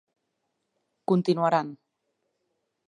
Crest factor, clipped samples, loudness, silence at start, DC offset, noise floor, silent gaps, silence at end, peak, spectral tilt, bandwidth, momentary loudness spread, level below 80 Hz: 20 dB; under 0.1%; -25 LUFS; 1.1 s; under 0.1%; -79 dBFS; none; 1.1 s; -10 dBFS; -7.5 dB/octave; 10.5 kHz; 15 LU; -82 dBFS